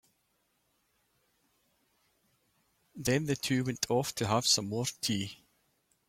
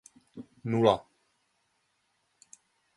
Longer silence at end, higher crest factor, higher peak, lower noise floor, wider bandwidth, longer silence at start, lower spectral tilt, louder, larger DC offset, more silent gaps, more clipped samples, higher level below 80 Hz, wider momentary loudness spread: second, 0.75 s vs 1.95 s; about the same, 22 dB vs 26 dB; second, -14 dBFS vs -8 dBFS; about the same, -76 dBFS vs -75 dBFS; first, 16.5 kHz vs 11.5 kHz; first, 2.95 s vs 0.35 s; second, -3.5 dB/octave vs -6.5 dB/octave; second, -31 LUFS vs -27 LUFS; neither; neither; neither; about the same, -66 dBFS vs -66 dBFS; second, 9 LU vs 25 LU